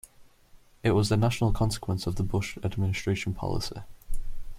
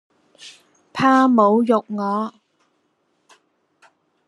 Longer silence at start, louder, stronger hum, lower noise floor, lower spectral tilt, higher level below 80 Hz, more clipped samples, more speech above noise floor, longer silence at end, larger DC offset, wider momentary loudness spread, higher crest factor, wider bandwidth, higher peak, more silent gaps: second, 0.2 s vs 0.45 s; second, -28 LUFS vs -17 LUFS; neither; second, -55 dBFS vs -67 dBFS; about the same, -6 dB/octave vs -6.5 dB/octave; first, -38 dBFS vs -72 dBFS; neither; second, 28 dB vs 51 dB; second, 0 s vs 2 s; neither; first, 18 LU vs 14 LU; about the same, 16 dB vs 20 dB; first, 15.5 kHz vs 11 kHz; second, -10 dBFS vs -2 dBFS; neither